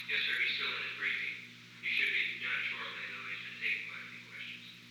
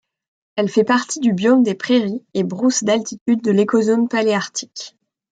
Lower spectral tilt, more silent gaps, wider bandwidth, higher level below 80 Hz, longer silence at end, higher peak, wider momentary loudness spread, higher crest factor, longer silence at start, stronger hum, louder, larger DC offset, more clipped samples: second, -1.5 dB/octave vs -4.5 dB/octave; second, none vs 3.21-3.26 s; first, over 20 kHz vs 9.2 kHz; second, -84 dBFS vs -66 dBFS; second, 0 s vs 0.45 s; second, -22 dBFS vs -4 dBFS; first, 14 LU vs 11 LU; about the same, 16 dB vs 14 dB; second, 0 s vs 0.55 s; first, 60 Hz at -60 dBFS vs none; second, -35 LUFS vs -18 LUFS; neither; neither